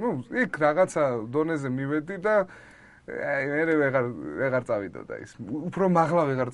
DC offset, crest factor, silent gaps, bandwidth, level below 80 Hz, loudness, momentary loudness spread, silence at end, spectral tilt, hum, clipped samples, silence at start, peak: under 0.1%; 18 dB; none; 11.5 kHz; -62 dBFS; -26 LUFS; 13 LU; 0 s; -7 dB/octave; none; under 0.1%; 0 s; -8 dBFS